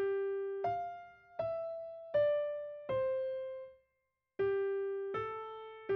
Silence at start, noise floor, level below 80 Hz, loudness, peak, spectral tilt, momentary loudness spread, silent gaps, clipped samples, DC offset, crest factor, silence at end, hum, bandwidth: 0 s; -84 dBFS; -72 dBFS; -37 LUFS; -24 dBFS; -4.5 dB/octave; 14 LU; none; under 0.1%; under 0.1%; 14 dB; 0 s; none; 5.4 kHz